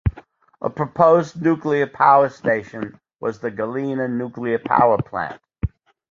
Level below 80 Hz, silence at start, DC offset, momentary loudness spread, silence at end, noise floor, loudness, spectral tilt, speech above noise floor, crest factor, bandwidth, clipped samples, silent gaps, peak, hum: -40 dBFS; 0.05 s; under 0.1%; 15 LU; 0.45 s; -47 dBFS; -20 LUFS; -8 dB/octave; 28 dB; 18 dB; 7.4 kHz; under 0.1%; none; -2 dBFS; none